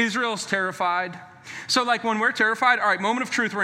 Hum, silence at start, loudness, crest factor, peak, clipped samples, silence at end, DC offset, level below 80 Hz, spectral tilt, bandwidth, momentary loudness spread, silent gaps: none; 0 s; -22 LUFS; 20 dB; -4 dBFS; under 0.1%; 0 s; under 0.1%; -72 dBFS; -2.5 dB/octave; 16 kHz; 13 LU; none